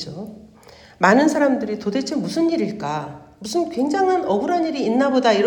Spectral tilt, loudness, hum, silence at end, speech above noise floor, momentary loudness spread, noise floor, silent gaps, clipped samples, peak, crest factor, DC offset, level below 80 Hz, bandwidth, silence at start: -5 dB/octave; -20 LUFS; none; 0 s; 27 dB; 14 LU; -46 dBFS; none; under 0.1%; -2 dBFS; 18 dB; under 0.1%; -60 dBFS; 18 kHz; 0 s